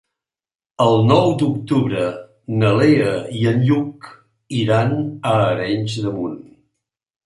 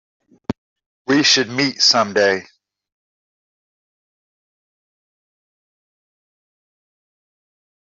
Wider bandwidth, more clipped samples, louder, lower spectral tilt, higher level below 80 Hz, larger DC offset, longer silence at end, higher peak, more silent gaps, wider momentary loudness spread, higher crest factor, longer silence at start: first, 11.5 kHz vs 7.8 kHz; neither; second, -18 LUFS vs -15 LUFS; first, -7.5 dB/octave vs -2.5 dB/octave; first, -52 dBFS vs -62 dBFS; neither; second, 0.85 s vs 5.4 s; about the same, -2 dBFS vs -2 dBFS; second, none vs 0.58-0.76 s, 0.86-1.05 s; second, 12 LU vs 19 LU; second, 16 dB vs 22 dB; first, 0.8 s vs 0.5 s